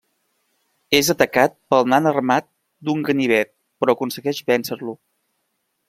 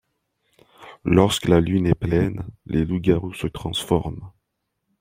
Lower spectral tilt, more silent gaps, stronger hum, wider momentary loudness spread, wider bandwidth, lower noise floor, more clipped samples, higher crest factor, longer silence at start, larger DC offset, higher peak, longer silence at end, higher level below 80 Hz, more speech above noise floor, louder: second, -4 dB/octave vs -6.5 dB/octave; neither; neither; about the same, 13 LU vs 13 LU; about the same, 16.5 kHz vs 16.5 kHz; second, -72 dBFS vs -77 dBFS; neither; about the same, 20 dB vs 20 dB; about the same, 0.9 s vs 0.8 s; neither; about the same, 0 dBFS vs -2 dBFS; first, 0.95 s vs 0.7 s; second, -60 dBFS vs -42 dBFS; about the same, 54 dB vs 57 dB; about the same, -19 LUFS vs -21 LUFS